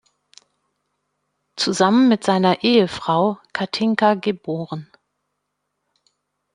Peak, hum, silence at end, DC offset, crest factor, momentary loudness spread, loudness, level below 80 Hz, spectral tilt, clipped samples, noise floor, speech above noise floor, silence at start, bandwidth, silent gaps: -2 dBFS; 50 Hz at -50 dBFS; 1.7 s; under 0.1%; 20 dB; 12 LU; -18 LUFS; -64 dBFS; -5 dB/octave; under 0.1%; -76 dBFS; 58 dB; 1.55 s; 10.5 kHz; none